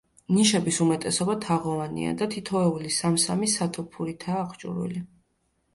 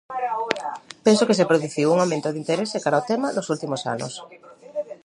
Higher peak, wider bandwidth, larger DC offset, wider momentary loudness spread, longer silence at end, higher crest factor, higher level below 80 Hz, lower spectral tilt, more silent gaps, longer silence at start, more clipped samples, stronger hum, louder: second, -8 dBFS vs 0 dBFS; about the same, 11.5 kHz vs 11.5 kHz; neither; second, 11 LU vs 14 LU; first, 0.7 s vs 0.1 s; about the same, 18 dB vs 22 dB; first, -60 dBFS vs -70 dBFS; about the same, -4.5 dB/octave vs -5 dB/octave; neither; first, 0.3 s vs 0.1 s; neither; neither; second, -26 LUFS vs -22 LUFS